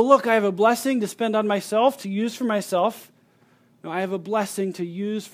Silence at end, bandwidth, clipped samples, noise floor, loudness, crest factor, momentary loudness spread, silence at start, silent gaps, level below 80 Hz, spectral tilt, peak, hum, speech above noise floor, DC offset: 0.05 s; 16 kHz; under 0.1%; -59 dBFS; -23 LUFS; 20 dB; 10 LU; 0 s; none; -78 dBFS; -5 dB/octave; -2 dBFS; none; 37 dB; under 0.1%